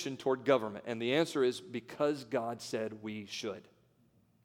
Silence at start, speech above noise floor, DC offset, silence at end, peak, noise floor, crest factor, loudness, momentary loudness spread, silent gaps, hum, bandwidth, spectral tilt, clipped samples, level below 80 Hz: 0 s; 35 dB; under 0.1%; 0.8 s; -14 dBFS; -69 dBFS; 22 dB; -35 LUFS; 12 LU; none; none; 16.5 kHz; -5 dB/octave; under 0.1%; -82 dBFS